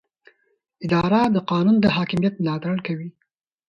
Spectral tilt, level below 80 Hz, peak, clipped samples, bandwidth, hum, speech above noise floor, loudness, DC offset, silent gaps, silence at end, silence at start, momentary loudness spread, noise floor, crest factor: -8 dB/octave; -54 dBFS; -6 dBFS; under 0.1%; 7.8 kHz; none; 48 dB; -21 LUFS; under 0.1%; none; 0.6 s; 0.8 s; 13 LU; -68 dBFS; 16 dB